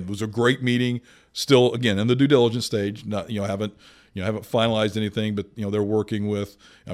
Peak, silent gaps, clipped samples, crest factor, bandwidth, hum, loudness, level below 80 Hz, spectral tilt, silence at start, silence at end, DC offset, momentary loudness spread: -4 dBFS; none; under 0.1%; 18 dB; 15.5 kHz; none; -23 LUFS; -60 dBFS; -6 dB/octave; 0 s; 0 s; under 0.1%; 12 LU